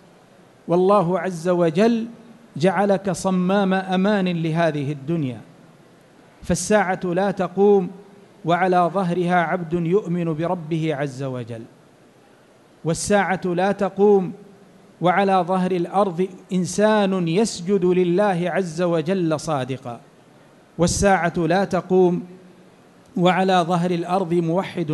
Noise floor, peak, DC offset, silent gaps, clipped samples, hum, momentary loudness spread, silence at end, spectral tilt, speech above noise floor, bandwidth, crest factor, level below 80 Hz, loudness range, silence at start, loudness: -52 dBFS; -4 dBFS; under 0.1%; none; under 0.1%; none; 12 LU; 0 s; -6 dB/octave; 32 dB; 12 kHz; 16 dB; -50 dBFS; 3 LU; 0.65 s; -20 LUFS